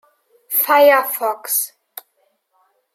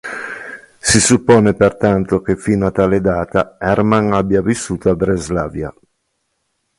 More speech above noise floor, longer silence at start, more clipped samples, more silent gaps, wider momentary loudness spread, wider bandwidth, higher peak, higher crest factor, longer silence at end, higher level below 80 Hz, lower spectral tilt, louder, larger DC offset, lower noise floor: second, 50 dB vs 55 dB; first, 0.5 s vs 0.05 s; neither; neither; first, 26 LU vs 15 LU; first, 16.5 kHz vs 11.5 kHz; about the same, -2 dBFS vs 0 dBFS; about the same, 18 dB vs 16 dB; first, 1.25 s vs 1.1 s; second, -84 dBFS vs -38 dBFS; second, 1 dB/octave vs -5 dB/octave; about the same, -16 LUFS vs -15 LUFS; neither; second, -65 dBFS vs -69 dBFS